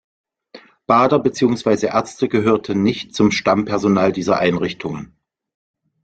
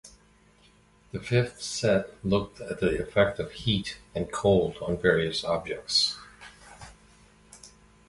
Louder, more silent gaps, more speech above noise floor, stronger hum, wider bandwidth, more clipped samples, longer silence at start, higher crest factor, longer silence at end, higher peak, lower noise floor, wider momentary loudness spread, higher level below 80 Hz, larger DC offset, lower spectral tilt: first, -17 LUFS vs -27 LUFS; neither; second, 28 dB vs 33 dB; neither; second, 9 kHz vs 11.5 kHz; neither; first, 0.55 s vs 0.05 s; about the same, 16 dB vs 20 dB; first, 1 s vs 0.4 s; first, -2 dBFS vs -8 dBFS; second, -45 dBFS vs -60 dBFS; second, 8 LU vs 18 LU; about the same, -52 dBFS vs -50 dBFS; neither; first, -6 dB/octave vs -4.5 dB/octave